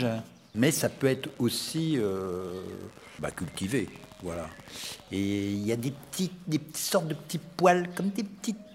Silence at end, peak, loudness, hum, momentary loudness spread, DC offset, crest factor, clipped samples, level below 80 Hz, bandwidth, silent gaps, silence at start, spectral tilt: 0 s; -8 dBFS; -30 LUFS; none; 13 LU; under 0.1%; 22 dB; under 0.1%; -64 dBFS; 16 kHz; none; 0 s; -5 dB/octave